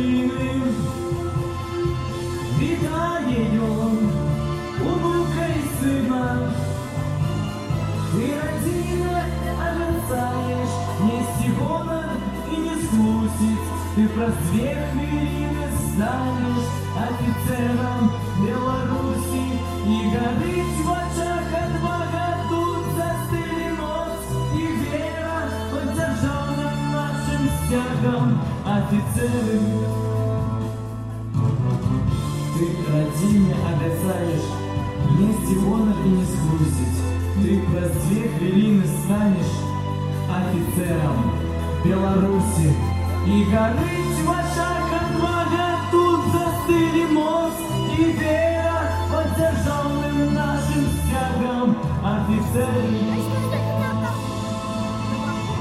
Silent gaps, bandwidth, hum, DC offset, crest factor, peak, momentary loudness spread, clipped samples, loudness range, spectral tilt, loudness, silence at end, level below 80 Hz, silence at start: none; 15.5 kHz; none; under 0.1%; 16 dB; -6 dBFS; 6 LU; under 0.1%; 4 LU; -6.5 dB/octave; -22 LUFS; 0 s; -36 dBFS; 0 s